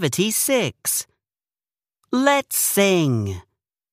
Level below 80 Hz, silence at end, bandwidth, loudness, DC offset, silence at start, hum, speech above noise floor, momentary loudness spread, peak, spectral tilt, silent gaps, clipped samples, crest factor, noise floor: -60 dBFS; 0.5 s; 15.5 kHz; -20 LUFS; under 0.1%; 0 s; none; over 70 dB; 11 LU; -4 dBFS; -3.5 dB/octave; none; under 0.1%; 18 dB; under -90 dBFS